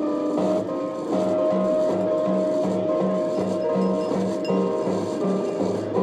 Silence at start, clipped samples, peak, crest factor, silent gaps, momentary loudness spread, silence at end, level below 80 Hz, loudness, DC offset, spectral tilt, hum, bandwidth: 0 s; under 0.1%; -10 dBFS; 12 dB; none; 3 LU; 0 s; -64 dBFS; -23 LUFS; under 0.1%; -7.5 dB/octave; none; 10.5 kHz